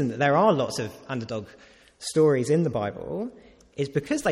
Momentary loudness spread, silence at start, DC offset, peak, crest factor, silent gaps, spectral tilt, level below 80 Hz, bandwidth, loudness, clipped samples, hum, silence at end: 15 LU; 0 s; under 0.1%; -8 dBFS; 18 dB; none; -6 dB/octave; -60 dBFS; 15 kHz; -25 LUFS; under 0.1%; none; 0 s